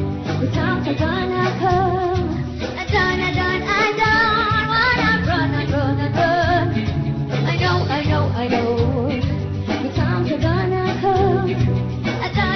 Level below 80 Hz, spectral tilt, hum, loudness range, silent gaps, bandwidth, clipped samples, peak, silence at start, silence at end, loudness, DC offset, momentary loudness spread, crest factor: -34 dBFS; -7 dB/octave; none; 3 LU; none; 6.4 kHz; under 0.1%; -4 dBFS; 0 s; 0 s; -19 LUFS; under 0.1%; 6 LU; 14 dB